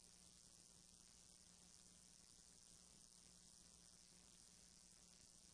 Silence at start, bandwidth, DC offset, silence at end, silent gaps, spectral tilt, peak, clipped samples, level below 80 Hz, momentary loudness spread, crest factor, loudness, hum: 0 s; 11 kHz; under 0.1%; 0 s; none; -1.5 dB/octave; -48 dBFS; under 0.1%; -80 dBFS; 1 LU; 20 dB; -65 LUFS; none